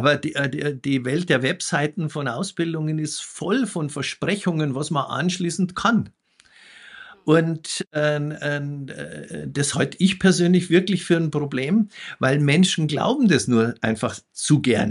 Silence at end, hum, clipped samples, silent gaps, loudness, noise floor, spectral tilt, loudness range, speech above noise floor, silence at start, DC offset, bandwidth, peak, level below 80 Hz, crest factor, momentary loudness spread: 0 s; none; under 0.1%; 7.87-7.91 s; -22 LUFS; -52 dBFS; -5 dB/octave; 5 LU; 31 dB; 0 s; under 0.1%; 11.5 kHz; -4 dBFS; -58 dBFS; 16 dB; 10 LU